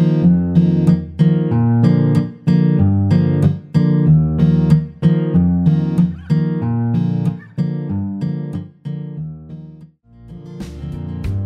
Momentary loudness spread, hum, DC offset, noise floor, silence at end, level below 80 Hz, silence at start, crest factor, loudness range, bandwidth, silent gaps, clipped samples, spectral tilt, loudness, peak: 15 LU; none; under 0.1%; -42 dBFS; 0 s; -38 dBFS; 0 s; 14 dB; 11 LU; 5.2 kHz; none; under 0.1%; -10.5 dB/octave; -16 LUFS; -2 dBFS